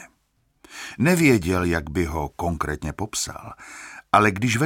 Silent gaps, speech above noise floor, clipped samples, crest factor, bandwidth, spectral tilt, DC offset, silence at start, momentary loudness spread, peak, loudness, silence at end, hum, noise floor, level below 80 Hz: none; 45 dB; under 0.1%; 22 dB; 17.5 kHz; -5 dB/octave; under 0.1%; 0 s; 21 LU; -2 dBFS; -22 LUFS; 0 s; none; -67 dBFS; -42 dBFS